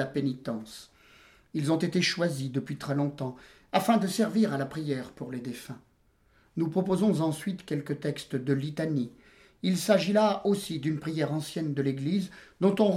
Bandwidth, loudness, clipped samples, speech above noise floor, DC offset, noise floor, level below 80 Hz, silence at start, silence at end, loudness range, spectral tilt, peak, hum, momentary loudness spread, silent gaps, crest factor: 16 kHz; -29 LUFS; under 0.1%; 37 dB; under 0.1%; -66 dBFS; -66 dBFS; 0 s; 0 s; 3 LU; -6 dB/octave; -10 dBFS; none; 13 LU; none; 20 dB